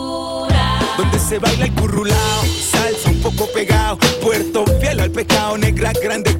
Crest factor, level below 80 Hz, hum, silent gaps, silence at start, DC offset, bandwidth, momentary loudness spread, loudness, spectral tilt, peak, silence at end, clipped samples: 14 dB; -24 dBFS; none; none; 0 s; under 0.1%; 16.5 kHz; 3 LU; -16 LUFS; -4.5 dB/octave; -2 dBFS; 0 s; under 0.1%